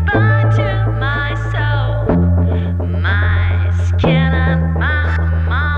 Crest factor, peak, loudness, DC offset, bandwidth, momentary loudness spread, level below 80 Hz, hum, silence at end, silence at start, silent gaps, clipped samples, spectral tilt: 14 dB; 0 dBFS; -15 LUFS; under 0.1%; 6.4 kHz; 4 LU; -26 dBFS; none; 0 s; 0 s; none; under 0.1%; -8 dB/octave